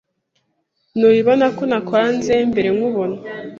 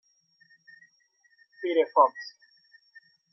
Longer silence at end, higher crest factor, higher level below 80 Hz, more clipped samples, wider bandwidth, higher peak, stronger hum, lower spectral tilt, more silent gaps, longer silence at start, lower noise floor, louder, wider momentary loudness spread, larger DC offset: second, 0 s vs 1.05 s; second, 16 dB vs 24 dB; first, -54 dBFS vs under -90 dBFS; neither; first, 7.2 kHz vs 6.2 kHz; first, -2 dBFS vs -8 dBFS; neither; first, -6 dB/octave vs 0.5 dB/octave; neither; second, 0.95 s vs 1.6 s; about the same, -68 dBFS vs -67 dBFS; first, -17 LUFS vs -25 LUFS; second, 10 LU vs 21 LU; neither